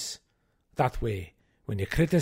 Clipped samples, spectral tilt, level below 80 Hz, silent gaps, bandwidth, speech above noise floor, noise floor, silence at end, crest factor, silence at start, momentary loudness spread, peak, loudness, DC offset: under 0.1%; -6 dB/octave; -42 dBFS; none; 16 kHz; 45 dB; -72 dBFS; 0 s; 18 dB; 0 s; 17 LU; -10 dBFS; -31 LUFS; under 0.1%